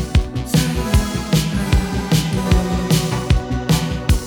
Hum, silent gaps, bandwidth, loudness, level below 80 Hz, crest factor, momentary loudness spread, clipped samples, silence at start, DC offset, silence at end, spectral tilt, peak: none; none; 19.5 kHz; -18 LUFS; -22 dBFS; 16 dB; 2 LU; under 0.1%; 0 s; 0.1%; 0 s; -5.5 dB/octave; -2 dBFS